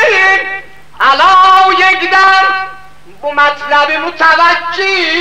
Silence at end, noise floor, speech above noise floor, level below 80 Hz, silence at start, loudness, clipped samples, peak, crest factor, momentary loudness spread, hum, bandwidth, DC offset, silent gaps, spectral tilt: 0 s; -37 dBFS; 26 dB; -48 dBFS; 0 s; -8 LUFS; under 0.1%; 0 dBFS; 10 dB; 12 LU; none; 11.5 kHz; 2%; none; -1.5 dB/octave